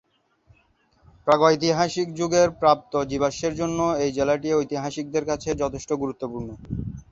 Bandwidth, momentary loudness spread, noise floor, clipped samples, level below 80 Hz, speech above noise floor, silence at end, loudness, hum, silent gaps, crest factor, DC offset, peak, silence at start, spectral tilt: 7.8 kHz; 13 LU; -63 dBFS; under 0.1%; -48 dBFS; 40 dB; 0.1 s; -23 LUFS; none; none; 20 dB; under 0.1%; -4 dBFS; 1.25 s; -5 dB/octave